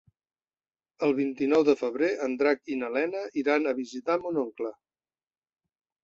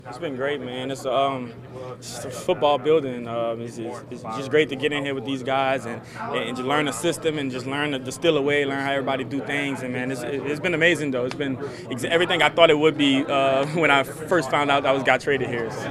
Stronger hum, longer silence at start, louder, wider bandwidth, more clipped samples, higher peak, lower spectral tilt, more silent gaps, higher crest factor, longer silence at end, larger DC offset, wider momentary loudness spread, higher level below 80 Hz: neither; first, 1 s vs 0.05 s; second, -28 LUFS vs -23 LUFS; second, 7.6 kHz vs 15 kHz; neither; second, -10 dBFS vs 0 dBFS; about the same, -5.5 dB/octave vs -4.5 dB/octave; neither; about the same, 20 dB vs 22 dB; first, 1.3 s vs 0 s; neither; second, 8 LU vs 13 LU; second, -74 dBFS vs -58 dBFS